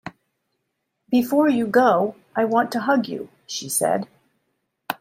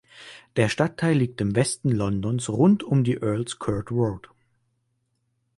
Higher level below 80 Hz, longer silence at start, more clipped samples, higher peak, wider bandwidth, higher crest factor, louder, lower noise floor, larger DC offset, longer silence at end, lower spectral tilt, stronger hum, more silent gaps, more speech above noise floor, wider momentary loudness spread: second, -68 dBFS vs -52 dBFS; about the same, 0.05 s vs 0.15 s; neither; about the same, -4 dBFS vs -6 dBFS; first, 16 kHz vs 11.5 kHz; about the same, 20 dB vs 18 dB; first, -21 LUFS vs -24 LUFS; about the same, -76 dBFS vs -73 dBFS; neither; second, 0.05 s vs 1.4 s; second, -4 dB/octave vs -6.5 dB/octave; neither; neither; first, 56 dB vs 50 dB; first, 15 LU vs 9 LU